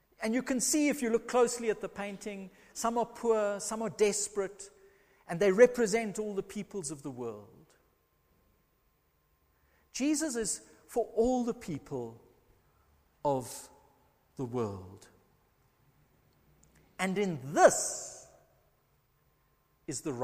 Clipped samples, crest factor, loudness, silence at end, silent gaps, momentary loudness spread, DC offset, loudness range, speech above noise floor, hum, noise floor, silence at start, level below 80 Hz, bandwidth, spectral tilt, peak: under 0.1%; 26 dB; -31 LUFS; 0 s; none; 19 LU; under 0.1%; 12 LU; 41 dB; none; -72 dBFS; 0.2 s; -64 dBFS; 15.5 kHz; -4 dB/octave; -8 dBFS